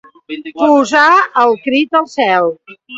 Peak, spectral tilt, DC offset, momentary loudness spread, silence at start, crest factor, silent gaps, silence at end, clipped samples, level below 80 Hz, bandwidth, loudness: 0 dBFS; -3.5 dB/octave; under 0.1%; 18 LU; 0.3 s; 12 dB; none; 0 s; under 0.1%; -62 dBFS; 8 kHz; -11 LUFS